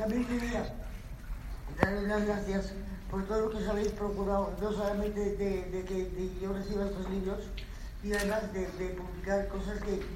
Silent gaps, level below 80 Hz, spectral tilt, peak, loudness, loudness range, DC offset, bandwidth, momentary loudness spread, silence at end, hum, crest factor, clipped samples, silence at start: none; -42 dBFS; -6.5 dB/octave; -8 dBFS; -34 LUFS; 3 LU; under 0.1%; 16 kHz; 12 LU; 0 s; none; 26 dB; under 0.1%; 0 s